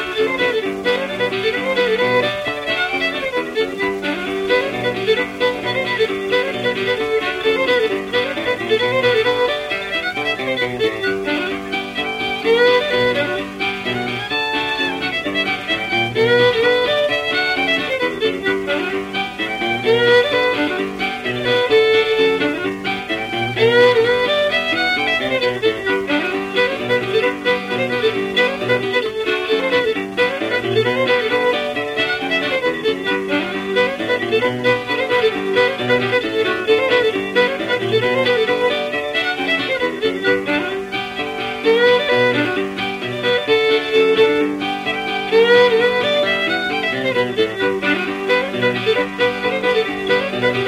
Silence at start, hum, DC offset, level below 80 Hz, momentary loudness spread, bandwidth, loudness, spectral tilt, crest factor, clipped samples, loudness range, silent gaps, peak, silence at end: 0 s; none; under 0.1%; -52 dBFS; 7 LU; 15 kHz; -17 LUFS; -4.5 dB/octave; 16 dB; under 0.1%; 3 LU; none; -2 dBFS; 0 s